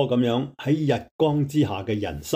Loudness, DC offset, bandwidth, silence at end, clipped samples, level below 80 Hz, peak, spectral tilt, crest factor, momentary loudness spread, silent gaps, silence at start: -24 LUFS; under 0.1%; 16 kHz; 0 s; under 0.1%; -52 dBFS; -8 dBFS; -7 dB/octave; 14 dB; 6 LU; 1.11-1.19 s; 0 s